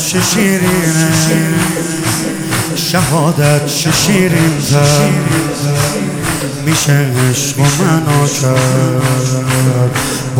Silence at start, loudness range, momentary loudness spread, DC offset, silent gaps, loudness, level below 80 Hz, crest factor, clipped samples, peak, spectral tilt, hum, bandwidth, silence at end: 0 s; 1 LU; 5 LU; under 0.1%; none; -12 LUFS; -38 dBFS; 12 dB; under 0.1%; 0 dBFS; -4.5 dB/octave; none; 17 kHz; 0 s